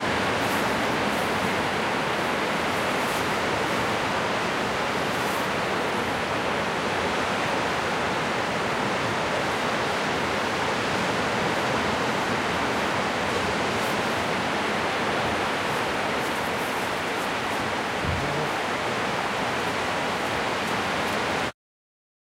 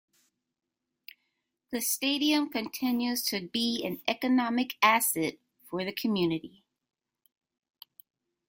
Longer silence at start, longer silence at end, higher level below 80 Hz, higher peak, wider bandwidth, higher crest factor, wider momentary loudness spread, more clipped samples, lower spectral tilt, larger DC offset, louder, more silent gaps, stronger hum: second, 0 s vs 1.7 s; second, 0.75 s vs 2 s; first, -50 dBFS vs -74 dBFS; second, -12 dBFS vs -8 dBFS; about the same, 16 kHz vs 17 kHz; second, 14 dB vs 22 dB; second, 2 LU vs 10 LU; neither; about the same, -4 dB/octave vs -3 dB/octave; neither; first, -25 LUFS vs -28 LUFS; neither; neither